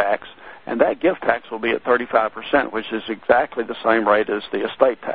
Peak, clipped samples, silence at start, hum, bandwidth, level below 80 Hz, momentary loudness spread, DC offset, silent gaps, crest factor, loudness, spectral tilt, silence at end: 0 dBFS; under 0.1%; 0 s; none; 4.9 kHz; -56 dBFS; 8 LU; 0.3%; none; 20 dB; -20 LUFS; -9 dB/octave; 0 s